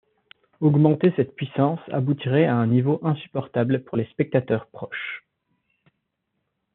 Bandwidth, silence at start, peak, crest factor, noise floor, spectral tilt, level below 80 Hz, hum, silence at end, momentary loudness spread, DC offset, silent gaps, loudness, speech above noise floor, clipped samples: 4.2 kHz; 0.6 s; -4 dBFS; 20 dB; -77 dBFS; -7.5 dB/octave; -66 dBFS; none; 1.55 s; 12 LU; under 0.1%; none; -23 LUFS; 55 dB; under 0.1%